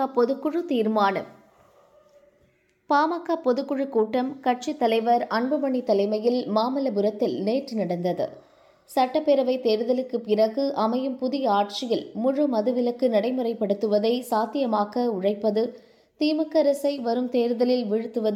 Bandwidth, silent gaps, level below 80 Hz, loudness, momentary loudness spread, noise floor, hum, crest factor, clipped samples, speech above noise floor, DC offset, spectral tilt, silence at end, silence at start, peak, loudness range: 15.5 kHz; none; -76 dBFS; -24 LUFS; 5 LU; -64 dBFS; none; 16 dB; under 0.1%; 40 dB; under 0.1%; -6 dB/octave; 0 s; 0 s; -8 dBFS; 3 LU